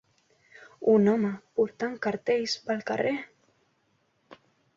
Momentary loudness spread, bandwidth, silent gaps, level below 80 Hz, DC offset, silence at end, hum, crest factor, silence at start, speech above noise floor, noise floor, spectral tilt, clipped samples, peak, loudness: 9 LU; 7.6 kHz; none; -72 dBFS; under 0.1%; 0.45 s; none; 18 dB; 0.6 s; 45 dB; -71 dBFS; -5.5 dB/octave; under 0.1%; -10 dBFS; -27 LUFS